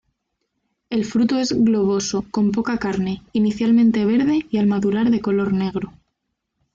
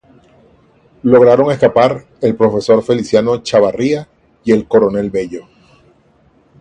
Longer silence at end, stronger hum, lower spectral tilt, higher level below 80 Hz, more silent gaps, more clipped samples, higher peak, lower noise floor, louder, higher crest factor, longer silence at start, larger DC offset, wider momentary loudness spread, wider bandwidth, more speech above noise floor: second, 0.85 s vs 1.2 s; neither; about the same, -6 dB/octave vs -6.5 dB/octave; about the same, -52 dBFS vs -48 dBFS; neither; neither; second, -8 dBFS vs 0 dBFS; first, -76 dBFS vs -52 dBFS; second, -19 LUFS vs -13 LUFS; about the same, 10 dB vs 14 dB; second, 0.9 s vs 1.05 s; neither; second, 8 LU vs 11 LU; second, 7.6 kHz vs 9.4 kHz; first, 58 dB vs 40 dB